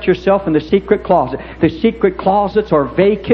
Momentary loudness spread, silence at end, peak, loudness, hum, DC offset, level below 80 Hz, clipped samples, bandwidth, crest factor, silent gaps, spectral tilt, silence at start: 2 LU; 0 s; 0 dBFS; -15 LUFS; none; under 0.1%; -38 dBFS; under 0.1%; 6.2 kHz; 14 dB; none; -9 dB/octave; 0 s